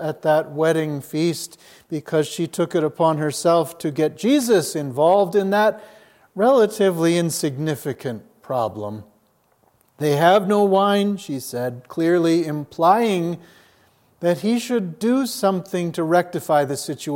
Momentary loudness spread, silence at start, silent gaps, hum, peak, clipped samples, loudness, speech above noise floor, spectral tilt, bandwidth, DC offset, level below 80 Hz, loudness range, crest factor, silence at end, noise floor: 11 LU; 0 s; none; none; -2 dBFS; under 0.1%; -20 LUFS; 42 dB; -5.5 dB/octave; 17 kHz; under 0.1%; -70 dBFS; 4 LU; 18 dB; 0 s; -62 dBFS